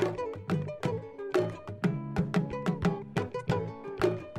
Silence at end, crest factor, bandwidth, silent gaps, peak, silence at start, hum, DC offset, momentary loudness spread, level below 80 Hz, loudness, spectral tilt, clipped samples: 0 s; 18 dB; 13 kHz; none; -14 dBFS; 0 s; none; under 0.1%; 5 LU; -54 dBFS; -32 LUFS; -7.5 dB/octave; under 0.1%